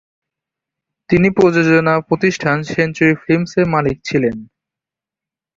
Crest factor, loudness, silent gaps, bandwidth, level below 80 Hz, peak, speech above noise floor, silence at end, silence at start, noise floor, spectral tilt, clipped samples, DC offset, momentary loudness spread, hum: 14 dB; -15 LUFS; none; 7.6 kHz; -48 dBFS; -2 dBFS; 73 dB; 1.1 s; 1.1 s; -88 dBFS; -7 dB/octave; under 0.1%; under 0.1%; 6 LU; none